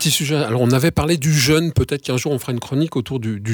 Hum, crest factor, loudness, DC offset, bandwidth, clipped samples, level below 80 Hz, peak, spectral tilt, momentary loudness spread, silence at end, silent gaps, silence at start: none; 14 dB; -18 LUFS; under 0.1%; over 20 kHz; under 0.1%; -40 dBFS; -4 dBFS; -5 dB/octave; 8 LU; 0 s; none; 0 s